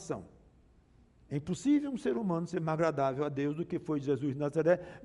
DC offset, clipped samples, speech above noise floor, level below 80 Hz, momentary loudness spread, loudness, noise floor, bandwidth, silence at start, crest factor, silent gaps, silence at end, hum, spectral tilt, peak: under 0.1%; under 0.1%; 31 dB; -66 dBFS; 8 LU; -33 LUFS; -63 dBFS; 11.5 kHz; 0 s; 18 dB; none; 0 s; none; -7.5 dB/octave; -14 dBFS